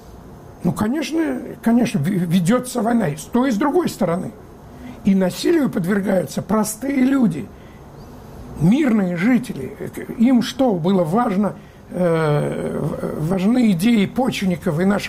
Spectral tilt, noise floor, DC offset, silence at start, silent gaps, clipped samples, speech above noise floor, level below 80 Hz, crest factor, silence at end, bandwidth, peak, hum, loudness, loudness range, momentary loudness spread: -6.5 dB/octave; -39 dBFS; under 0.1%; 0 s; none; under 0.1%; 21 dB; -46 dBFS; 12 dB; 0 s; 16 kHz; -8 dBFS; none; -19 LUFS; 2 LU; 13 LU